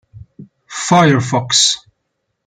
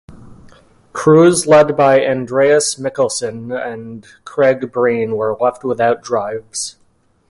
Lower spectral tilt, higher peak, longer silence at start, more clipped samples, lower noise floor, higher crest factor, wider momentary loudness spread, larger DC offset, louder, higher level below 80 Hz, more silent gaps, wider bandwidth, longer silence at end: about the same, -3.5 dB/octave vs -4.5 dB/octave; about the same, 0 dBFS vs 0 dBFS; about the same, 0.15 s vs 0.1 s; neither; first, -71 dBFS vs -56 dBFS; about the same, 16 dB vs 16 dB; second, 13 LU vs 16 LU; neither; about the same, -13 LUFS vs -14 LUFS; about the same, -54 dBFS vs -54 dBFS; neither; second, 10 kHz vs 11.5 kHz; about the same, 0.7 s vs 0.6 s